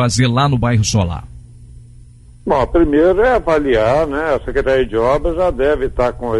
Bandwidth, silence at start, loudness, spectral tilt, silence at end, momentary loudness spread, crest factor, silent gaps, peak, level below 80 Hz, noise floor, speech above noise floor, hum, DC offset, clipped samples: 11.5 kHz; 0 s; -15 LUFS; -6 dB/octave; 0 s; 6 LU; 12 dB; none; -2 dBFS; -28 dBFS; -40 dBFS; 26 dB; none; under 0.1%; under 0.1%